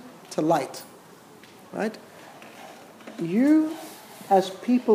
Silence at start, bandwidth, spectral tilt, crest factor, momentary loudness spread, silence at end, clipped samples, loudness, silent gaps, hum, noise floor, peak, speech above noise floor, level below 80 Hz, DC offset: 0.05 s; 16 kHz; -6 dB/octave; 18 dB; 24 LU; 0 s; under 0.1%; -25 LUFS; none; none; -49 dBFS; -8 dBFS; 27 dB; -82 dBFS; under 0.1%